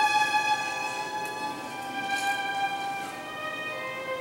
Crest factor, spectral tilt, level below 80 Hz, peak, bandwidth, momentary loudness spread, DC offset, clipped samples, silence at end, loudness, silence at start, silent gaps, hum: 16 dB; -1.5 dB/octave; -70 dBFS; -14 dBFS; 16 kHz; 10 LU; under 0.1%; under 0.1%; 0 s; -29 LUFS; 0 s; none; none